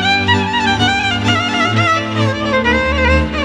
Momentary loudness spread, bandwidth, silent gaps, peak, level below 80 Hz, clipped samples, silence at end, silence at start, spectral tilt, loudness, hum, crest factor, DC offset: 2 LU; 11 kHz; none; -2 dBFS; -26 dBFS; under 0.1%; 0 s; 0 s; -5 dB/octave; -13 LUFS; none; 12 dB; under 0.1%